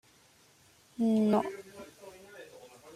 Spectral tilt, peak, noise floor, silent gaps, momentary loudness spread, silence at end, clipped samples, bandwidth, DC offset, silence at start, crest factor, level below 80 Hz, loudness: -7 dB/octave; -16 dBFS; -63 dBFS; none; 24 LU; 0.05 s; under 0.1%; 14 kHz; under 0.1%; 1 s; 18 dB; -74 dBFS; -29 LUFS